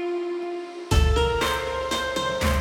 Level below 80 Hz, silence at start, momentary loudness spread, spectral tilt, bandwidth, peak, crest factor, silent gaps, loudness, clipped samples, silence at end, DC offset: -28 dBFS; 0 s; 9 LU; -5 dB/octave; 17.5 kHz; -8 dBFS; 16 dB; none; -25 LUFS; under 0.1%; 0 s; under 0.1%